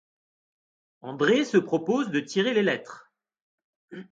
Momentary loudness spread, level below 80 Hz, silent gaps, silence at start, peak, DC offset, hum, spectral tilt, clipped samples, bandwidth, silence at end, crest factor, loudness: 22 LU; -74 dBFS; 3.42-3.58 s, 3.64-3.88 s; 1.05 s; -8 dBFS; under 0.1%; none; -5 dB/octave; under 0.1%; 9 kHz; 0.1 s; 20 dB; -25 LUFS